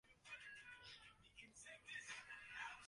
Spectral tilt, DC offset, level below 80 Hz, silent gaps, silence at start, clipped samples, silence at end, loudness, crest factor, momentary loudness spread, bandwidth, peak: -0.5 dB/octave; under 0.1%; -82 dBFS; none; 0.05 s; under 0.1%; 0 s; -56 LUFS; 18 dB; 10 LU; 11.5 kHz; -40 dBFS